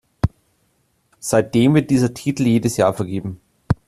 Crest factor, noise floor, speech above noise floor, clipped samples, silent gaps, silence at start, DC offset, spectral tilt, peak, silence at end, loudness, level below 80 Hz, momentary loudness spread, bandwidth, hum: 16 dB; -64 dBFS; 47 dB; under 0.1%; none; 0.25 s; under 0.1%; -6.5 dB/octave; -2 dBFS; 0.15 s; -18 LUFS; -40 dBFS; 11 LU; 14 kHz; none